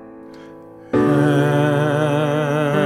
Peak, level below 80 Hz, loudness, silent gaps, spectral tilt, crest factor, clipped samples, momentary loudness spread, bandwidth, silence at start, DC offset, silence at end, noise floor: -4 dBFS; -54 dBFS; -17 LUFS; none; -7.5 dB/octave; 14 dB; under 0.1%; 3 LU; 14.5 kHz; 0 s; under 0.1%; 0 s; -39 dBFS